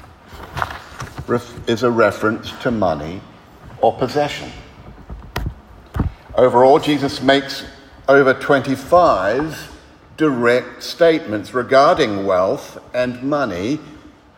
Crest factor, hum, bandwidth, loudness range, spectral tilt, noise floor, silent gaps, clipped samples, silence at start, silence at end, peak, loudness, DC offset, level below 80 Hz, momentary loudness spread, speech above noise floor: 18 dB; none; 16 kHz; 7 LU; -5.5 dB/octave; -40 dBFS; none; under 0.1%; 0.3 s; 0.3 s; 0 dBFS; -17 LUFS; under 0.1%; -40 dBFS; 18 LU; 24 dB